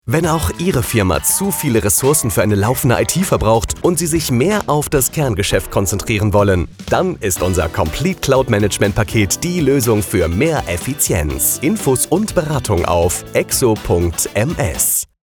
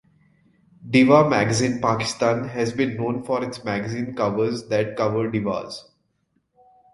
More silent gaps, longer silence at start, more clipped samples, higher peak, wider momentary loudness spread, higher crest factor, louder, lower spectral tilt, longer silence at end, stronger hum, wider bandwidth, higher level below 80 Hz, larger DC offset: neither; second, 0.05 s vs 0.8 s; neither; about the same, -2 dBFS vs -2 dBFS; second, 4 LU vs 11 LU; second, 14 dB vs 22 dB; first, -15 LUFS vs -22 LUFS; about the same, -4.5 dB/octave vs -5.5 dB/octave; second, 0.2 s vs 1.15 s; neither; first, over 20 kHz vs 11.5 kHz; first, -32 dBFS vs -56 dBFS; neither